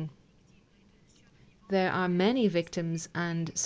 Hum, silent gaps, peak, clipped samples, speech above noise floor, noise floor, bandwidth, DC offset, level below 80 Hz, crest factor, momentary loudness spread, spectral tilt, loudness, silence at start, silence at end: none; none; -12 dBFS; under 0.1%; 33 dB; -62 dBFS; 8 kHz; under 0.1%; -66 dBFS; 18 dB; 8 LU; -5 dB/octave; -29 LUFS; 0 s; 0 s